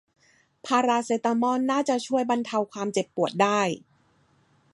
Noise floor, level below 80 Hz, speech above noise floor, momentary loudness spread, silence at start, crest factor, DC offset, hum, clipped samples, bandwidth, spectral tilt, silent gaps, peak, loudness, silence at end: -64 dBFS; -76 dBFS; 39 dB; 6 LU; 0.65 s; 18 dB; under 0.1%; none; under 0.1%; 11.5 kHz; -4.5 dB/octave; none; -8 dBFS; -25 LUFS; 0.95 s